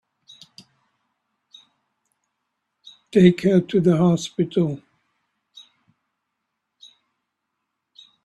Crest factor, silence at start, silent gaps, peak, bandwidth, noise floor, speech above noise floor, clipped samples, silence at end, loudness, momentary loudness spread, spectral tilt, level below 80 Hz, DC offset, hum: 24 dB; 3.15 s; none; -2 dBFS; 8.8 kHz; -79 dBFS; 61 dB; under 0.1%; 3.5 s; -19 LUFS; 8 LU; -7.5 dB/octave; -62 dBFS; under 0.1%; none